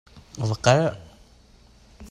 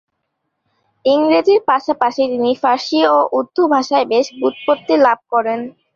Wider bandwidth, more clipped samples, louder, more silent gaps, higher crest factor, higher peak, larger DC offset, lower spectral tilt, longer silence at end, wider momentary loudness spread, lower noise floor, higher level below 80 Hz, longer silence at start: first, 12 kHz vs 7.4 kHz; neither; second, -22 LUFS vs -15 LUFS; neither; first, 22 dB vs 16 dB; second, -4 dBFS vs 0 dBFS; neither; first, -5.5 dB/octave vs -4 dB/octave; second, 0.05 s vs 0.25 s; first, 24 LU vs 6 LU; second, -53 dBFS vs -72 dBFS; first, -52 dBFS vs -64 dBFS; second, 0.15 s vs 1.05 s